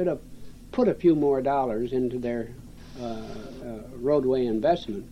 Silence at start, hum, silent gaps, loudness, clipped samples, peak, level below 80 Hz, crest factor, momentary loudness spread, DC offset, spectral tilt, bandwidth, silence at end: 0 s; none; none; -26 LUFS; under 0.1%; -10 dBFS; -48 dBFS; 16 dB; 17 LU; 0.2%; -8 dB/octave; 12.5 kHz; 0 s